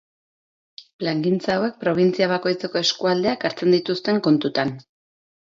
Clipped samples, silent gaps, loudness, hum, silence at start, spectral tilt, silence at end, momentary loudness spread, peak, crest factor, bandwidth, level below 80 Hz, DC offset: under 0.1%; 0.93-0.99 s; -21 LUFS; none; 0.8 s; -5.5 dB/octave; 0.7 s; 6 LU; -6 dBFS; 16 dB; 7.6 kHz; -64 dBFS; under 0.1%